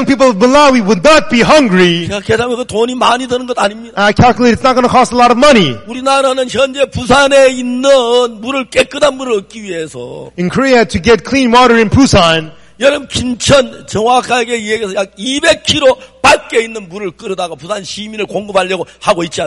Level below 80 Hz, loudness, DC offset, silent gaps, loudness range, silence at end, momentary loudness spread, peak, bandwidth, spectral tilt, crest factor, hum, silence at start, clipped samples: -36 dBFS; -10 LUFS; under 0.1%; none; 4 LU; 0 s; 12 LU; 0 dBFS; 11.5 kHz; -4.5 dB/octave; 10 dB; none; 0 s; under 0.1%